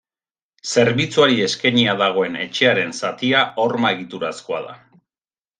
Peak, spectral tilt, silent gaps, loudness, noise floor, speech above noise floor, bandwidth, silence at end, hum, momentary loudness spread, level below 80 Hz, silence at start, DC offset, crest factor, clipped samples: -2 dBFS; -4 dB/octave; none; -18 LUFS; under -90 dBFS; over 71 dB; 9.6 kHz; 0.85 s; none; 12 LU; -62 dBFS; 0.65 s; under 0.1%; 18 dB; under 0.1%